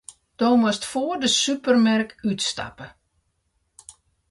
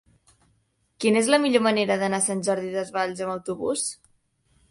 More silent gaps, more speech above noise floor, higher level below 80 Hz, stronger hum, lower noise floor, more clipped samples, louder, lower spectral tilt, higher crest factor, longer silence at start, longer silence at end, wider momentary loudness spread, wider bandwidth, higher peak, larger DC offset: neither; first, 50 dB vs 45 dB; first, -60 dBFS vs -66 dBFS; neither; about the same, -71 dBFS vs -68 dBFS; neither; first, -21 LUFS vs -24 LUFS; about the same, -3.5 dB/octave vs -3.5 dB/octave; about the same, 18 dB vs 20 dB; second, 0.1 s vs 1 s; first, 1.4 s vs 0.75 s; about the same, 11 LU vs 10 LU; about the same, 11.5 kHz vs 11.5 kHz; about the same, -6 dBFS vs -4 dBFS; neither